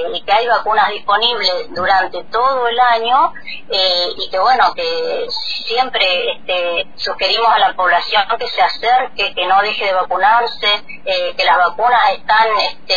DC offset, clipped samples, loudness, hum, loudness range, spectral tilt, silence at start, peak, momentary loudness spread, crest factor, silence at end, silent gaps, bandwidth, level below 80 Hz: 3%; under 0.1%; -14 LUFS; none; 2 LU; -2 dB/octave; 0 s; -2 dBFS; 6 LU; 14 dB; 0 s; none; 5 kHz; -50 dBFS